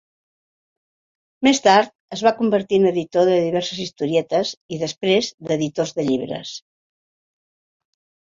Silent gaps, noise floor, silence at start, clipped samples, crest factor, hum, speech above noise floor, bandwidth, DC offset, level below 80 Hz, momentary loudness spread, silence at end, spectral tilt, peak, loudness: 1.95-2.08 s, 4.57-4.69 s, 5.34-5.38 s; under -90 dBFS; 1.4 s; under 0.1%; 20 dB; none; over 71 dB; 7.8 kHz; under 0.1%; -62 dBFS; 11 LU; 1.7 s; -4.5 dB/octave; -2 dBFS; -20 LUFS